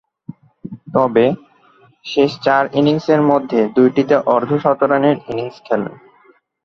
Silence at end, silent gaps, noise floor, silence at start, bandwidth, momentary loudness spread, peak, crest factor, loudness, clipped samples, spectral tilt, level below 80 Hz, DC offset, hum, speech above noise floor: 0.7 s; none; -52 dBFS; 0.65 s; 6.8 kHz; 14 LU; 0 dBFS; 16 dB; -16 LUFS; under 0.1%; -7.5 dB/octave; -58 dBFS; under 0.1%; none; 38 dB